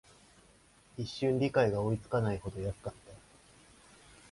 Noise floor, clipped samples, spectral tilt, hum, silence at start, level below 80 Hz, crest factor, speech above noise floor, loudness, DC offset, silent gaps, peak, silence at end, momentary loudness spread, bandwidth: -63 dBFS; under 0.1%; -7 dB/octave; none; 0.95 s; -56 dBFS; 20 dB; 31 dB; -33 LUFS; under 0.1%; none; -16 dBFS; 1.15 s; 20 LU; 11.5 kHz